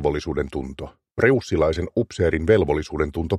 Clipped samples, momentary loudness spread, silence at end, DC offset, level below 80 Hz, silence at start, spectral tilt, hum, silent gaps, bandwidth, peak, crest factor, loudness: under 0.1%; 13 LU; 0 s; under 0.1%; -36 dBFS; 0 s; -7 dB/octave; none; none; 11.5 kHz; -2 dBFS; 20 dB; -22 LUFS